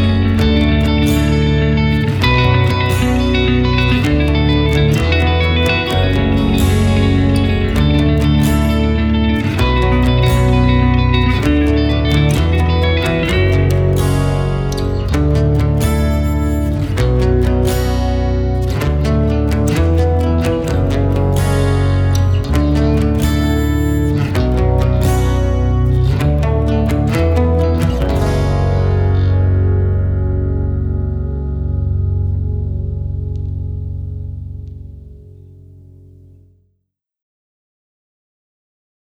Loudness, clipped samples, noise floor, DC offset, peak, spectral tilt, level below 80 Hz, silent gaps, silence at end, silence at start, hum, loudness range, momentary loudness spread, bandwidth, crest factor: -15 LUFS; under 0.1%; -70 dBFS; under 0.1%; 0 dBFS; -7 dB/octave; -20 dBFS; none; 3.85 s; 0 s; none; 7 LU; 6 LU; 18 kHz; 12 dB